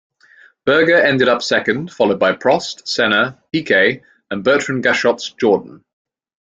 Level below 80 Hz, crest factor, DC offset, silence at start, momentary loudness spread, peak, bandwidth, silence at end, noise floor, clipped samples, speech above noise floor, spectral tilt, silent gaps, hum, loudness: -58 dBFS; 16 dB; under 0.1%; 0.65 s; 8 LU; 0 dBFS; 7.8 kHz; 0.8 s; -49 dBFS; under 0.1%; 33 dB; -4.5 dB/octave; none; none; -15 LUFS